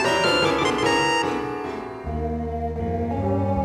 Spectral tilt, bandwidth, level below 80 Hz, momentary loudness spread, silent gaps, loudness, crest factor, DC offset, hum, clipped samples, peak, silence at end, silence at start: -5 dB/octave; 15 kHz; -38 dBFS; 11 LU; none; -23 LUFS; 16 dB; under 0.1%; none; under 0.1%; -8 dBFS; 0 s; 0 s